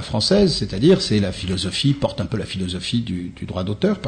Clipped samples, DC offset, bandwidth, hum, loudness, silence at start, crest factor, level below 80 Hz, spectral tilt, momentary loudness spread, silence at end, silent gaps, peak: under 0.1%; under 0.1%; 9.6 kHz; none; -20 LUFS; 0 s; 16 dB; -40 dBFS; -5.5 dB/octave; 10 LU; 0 s; none; -4 dBFS